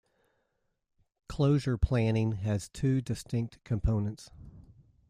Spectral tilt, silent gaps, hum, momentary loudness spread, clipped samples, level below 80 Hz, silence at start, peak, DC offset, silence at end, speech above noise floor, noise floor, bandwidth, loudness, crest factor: -7.5 dB/octave; none; none; 10 LU; under 0.1%; -42 dBFS; 1.3 s; -14 dBFS; under 0.1%; 0.5 s; 49 dB; -78 dBFS; 12.5 kHz; -31 LUFS; 18 dB